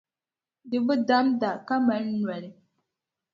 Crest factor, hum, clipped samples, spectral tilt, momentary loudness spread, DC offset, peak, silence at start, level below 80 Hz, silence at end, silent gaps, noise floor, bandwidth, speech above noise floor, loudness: 18 dB; none; under 0.1%; -7 dB/octave; 10 LU; under 0.1%; -10 dBFS; 0.65 s; -74 dBFS; 0.8 s; none; under -90 dBFS; 7 kHz; over 65 dB; -26 LUFS